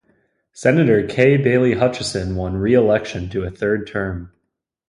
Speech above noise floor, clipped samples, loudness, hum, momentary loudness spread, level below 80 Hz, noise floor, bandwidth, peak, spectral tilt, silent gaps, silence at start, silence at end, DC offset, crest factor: 58 dB; under 0.1%; -18 LUFS; none; 10 LU; -40 dBFS; -75 dBFS; 11.5 kHz; 0 dBFS; -6.5 dB/octave; none; 0.55 s; 0.6 s; under 0.1%; 18 dB